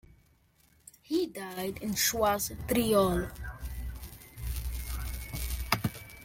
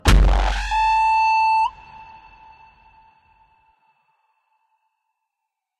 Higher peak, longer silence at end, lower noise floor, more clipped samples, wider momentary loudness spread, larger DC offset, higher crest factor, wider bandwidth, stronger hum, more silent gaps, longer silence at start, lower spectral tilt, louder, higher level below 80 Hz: second, -6 dBFS vs -2 dBFS; second, 0 s vs 3.75 s; second, -66 dBFS vs -82 dBFS; neither; second, 15 LU vs 25 LU; neither; first, 26 dB vs 20 dB; first, 17 kHz vs 13 kHz; neither; neither; first, 1.1 s vs 0.05 s; about the same, -4 dB/octave vs -4.5 dB/octave; second, -32 LUFS vs -18 LUFS; second, -42 dBFS vs -26 dBFS